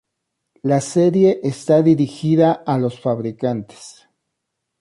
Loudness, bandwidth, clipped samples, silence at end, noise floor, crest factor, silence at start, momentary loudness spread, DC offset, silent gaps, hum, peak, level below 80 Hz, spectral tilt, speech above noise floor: -18 LUFS; 11.5 kHz; under 0.1%; 0.9 s; -77 dBFS; 16 dB; 0.65 s; 9 LU; under 0.1%; none; none; -4 dBFS; -60 dBFS; -7.5 dB/octave; 61 dB